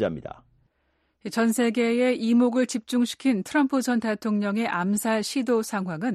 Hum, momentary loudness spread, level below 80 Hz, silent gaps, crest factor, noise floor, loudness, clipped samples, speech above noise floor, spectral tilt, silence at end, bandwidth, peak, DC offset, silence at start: none; 8 LU; -64 dBFS; none; 14 dB; -71 dBFS; -24 LUFS; under 0.1%; 47 dB; -5 dB/octave; 0 s; 13 kHz; -12 dBFS; under 0.1%; 0 s